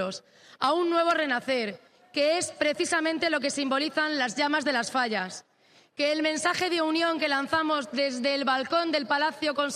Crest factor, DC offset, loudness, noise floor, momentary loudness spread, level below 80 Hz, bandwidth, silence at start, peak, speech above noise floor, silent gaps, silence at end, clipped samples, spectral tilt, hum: 16 dB; under 0.1%; -26 LUFS; -61 dBFS; 5 LU; -74 dBFS; 13.5 kHz; 0 s; -10 dBFS; 34 dB; none; 0 s; under 0.1%; -2.5 dB/octave; none